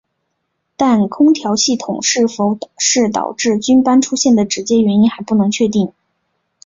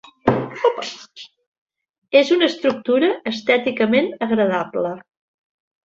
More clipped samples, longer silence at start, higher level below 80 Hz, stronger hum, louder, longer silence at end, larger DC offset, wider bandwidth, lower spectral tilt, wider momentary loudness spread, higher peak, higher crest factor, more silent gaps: neither; first, 0.8 s vs 0.25 s; first, -54 dBFS vs -60 dBFS; neither; first, -14 LUFS vs -19 LUFS; about the same, 0.75 s vs 0.85 s; neither; about the same, 7.8 kHz vs 7.8 kHz; second, -4 dB/octave vs -5.5 dB/octave; second, 5 LU vs 12 LU; about the same, 0 dBFS vs -2 dBFS; about the same, 14 dB vs 18 dB; second, none vs 1.47-1.52 s, 1.58-1.66 s, 1.89-2.02 s